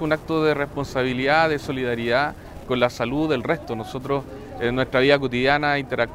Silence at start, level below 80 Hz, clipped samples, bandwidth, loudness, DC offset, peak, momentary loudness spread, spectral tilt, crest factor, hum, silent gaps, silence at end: 0 s; -46 dBFS; under 0.1%; 16 kHz; -22 LUFS; under 0.1%; -2 dBFS; 9 LU; -6 dB/octave; 20 dB; none; none; 0 s